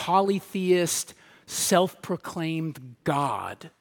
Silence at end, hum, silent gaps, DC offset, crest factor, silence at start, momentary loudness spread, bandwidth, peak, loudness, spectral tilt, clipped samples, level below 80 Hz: 0.15 s; none; none; under 0.1%; 20 dB; 0 s; 11 LU; 17.5 kHz; -6 dBFS; -26 LUFS; -4 dB/octave; under 0.1%; -68 dBFS